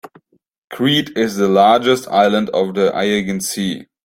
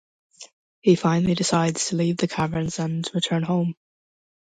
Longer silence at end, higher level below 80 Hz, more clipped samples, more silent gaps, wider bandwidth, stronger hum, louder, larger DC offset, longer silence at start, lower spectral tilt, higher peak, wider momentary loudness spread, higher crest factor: second, 0.2 s vs 0.85 s; about the same, -56 dBFS vs -56 dBFS; neither; second, 0.58-0.68 s vs 0.53-0.82 s; first, 16.5 kHz vs 9.4 kHz; neither; first, -16 LUFS vs -23 LUFS; neither; second, 0.05 s vs 0.4 s; about the same, -4.5 dB/octave vs -5 dB/octave; first, -2 dBFS vs -6 dBFS; about the same, 9 LU vs 7 LU; about the same, 14 dB vs 18 dB